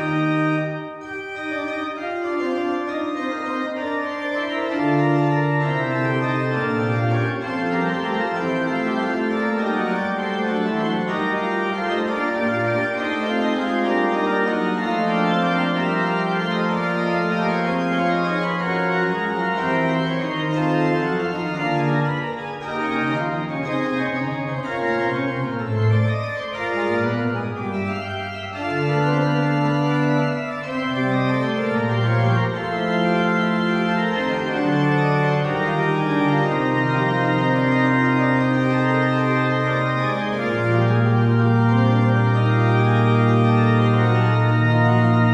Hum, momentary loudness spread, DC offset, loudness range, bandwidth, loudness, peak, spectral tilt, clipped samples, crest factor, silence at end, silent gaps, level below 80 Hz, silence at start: none; 8 LU; under 0.1%; 5 LU; 8.4 kHz; -21 LUFS; -6 dBFS; -7.5 dB/octave; under 0.1%; 14 dB; 0 s; none; -56 dBFS; 0 s